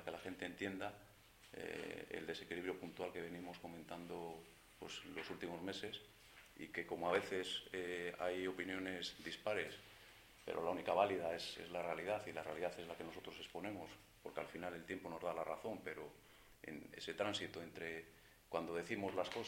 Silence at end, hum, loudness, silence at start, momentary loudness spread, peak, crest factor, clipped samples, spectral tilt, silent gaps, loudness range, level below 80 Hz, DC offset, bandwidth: 0 s; none; -46 LUFS; 0 s; 15 LU; -20 dBFS; 26 dB; under 0.1%; -4 dB/octave; none; 6 LU; -74 dBFS; under 0.1%; 16.5 kHz